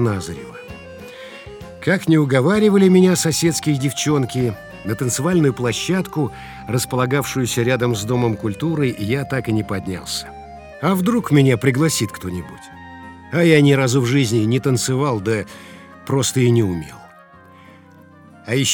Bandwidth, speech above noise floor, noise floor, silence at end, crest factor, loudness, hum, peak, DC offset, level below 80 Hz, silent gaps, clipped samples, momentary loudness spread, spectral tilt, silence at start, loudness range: over 20 kHz; 28 dB; -45 dBFS; 0 s; 18 dB; -18 LUFS; none; 0 dBFS; under 0.1%; -50 dBFS; none; under 0.1%; 21 LU; -5.5 dB/octave; 0 s; 5 LU